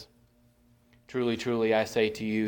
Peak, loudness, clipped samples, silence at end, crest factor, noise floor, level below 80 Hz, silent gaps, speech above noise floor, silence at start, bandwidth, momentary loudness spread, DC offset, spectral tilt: -12 dBFS; -28 LUFS; under 0.1%; 0 s; 18 dB; -63 dBFS; -64 dBFS; none; 36 dB; 0 s; 19 kHz; 6 LU; under 0.1%; -5.5 dB/octave